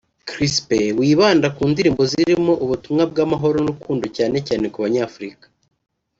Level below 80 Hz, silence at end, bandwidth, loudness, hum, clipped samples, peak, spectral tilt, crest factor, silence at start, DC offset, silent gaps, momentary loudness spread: -50 dBFS; 0.9 s; 7.8 kHz; -18 LUFS; none; under 0.1%; -2 dBFS; -5.5 dB/octave; 16 dB; 0.25 s; under 0.1%; none; 9 LU